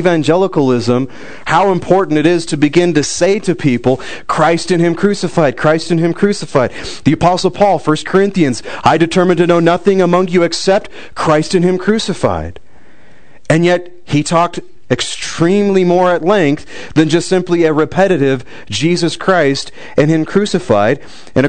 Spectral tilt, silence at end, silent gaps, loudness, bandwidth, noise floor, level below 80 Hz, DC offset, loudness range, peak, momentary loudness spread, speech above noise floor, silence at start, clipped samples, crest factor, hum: -5.5 dB/octave; 0 s; none; -13 LUFS; 9.4 kHz; -45 dBFS; -44 dBFS; 4%; 3 LU; 0 dBFS; 7 LU; 33 dB; 0 s; under 0.1%; 12 dB; none